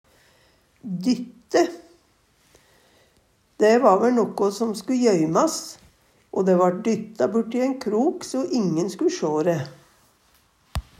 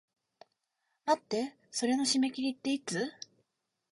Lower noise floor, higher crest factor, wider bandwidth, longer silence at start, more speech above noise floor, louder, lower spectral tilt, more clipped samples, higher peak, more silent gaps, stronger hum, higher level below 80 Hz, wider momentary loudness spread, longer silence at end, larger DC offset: second, -62 dBFS vs -83 dBFS; about the same, 20 dB vs 20 dB; first, 15.5 kHz vs 11.5 kHz; second, 0.85 s vs 1.05 s; second, 41 dB vs 51 dB; first, -22 LUFS vs -32 LUFS; first, -5.5 dB/octave vs -3 dB/octave; neither; first, -4 dBFS vs -14 dBFS; neither; neither; first, -50 dBFS vs -80 dBFS; about the same, 12 LU vs 11 LU; second, 0.2 s vs 0.8 s; neither